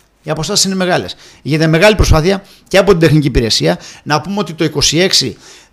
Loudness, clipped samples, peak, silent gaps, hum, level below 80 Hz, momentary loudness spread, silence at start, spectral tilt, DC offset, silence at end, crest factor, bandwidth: -12 LUFS; 0.2%; 0 dBFS; none; none; -26 dBFS; 11 LU; 0.25 s; -4 dB/octave; under 0.1%; 0.4 s; 12 dB; 16 kHz